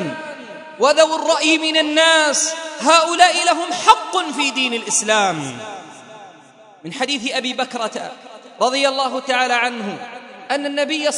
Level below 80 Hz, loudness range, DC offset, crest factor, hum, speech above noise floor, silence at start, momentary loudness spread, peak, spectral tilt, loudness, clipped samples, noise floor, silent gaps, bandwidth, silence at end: -68 dBFS; 8 LU; under 0.1%; 18 dB; none; 28 dB; 0 s; 19 LU; 0 dBFS; -1.5 dB/octave; -16 LUFS; under 0.1%; -45 dBFS; none; 12 kHz; 0 s